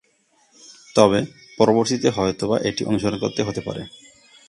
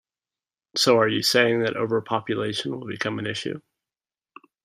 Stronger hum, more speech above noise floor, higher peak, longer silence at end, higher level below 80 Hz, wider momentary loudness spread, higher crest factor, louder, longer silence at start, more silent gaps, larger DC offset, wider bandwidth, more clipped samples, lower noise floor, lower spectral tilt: neither; second, 42 dB vs over 67 dB; first, 0 dBFS vs -4 dBFS; second, 0.6 s vs 1.05 s; first, -52 dBFS vs -68 dBFS; about the same, 14 LU vs 12 LU; about the same, 22 dB vs 20 dB; about the same, -21 LUFS vs -23 LUFS; about the same, 0.7 s vs 0.75 s; neither; neither; second, 11.5 kHz vs 15.5 kHz; neither; second, -62 dBFS vs under -90 dBFS; about the same, -5 dB/octave vs -4 dB/octave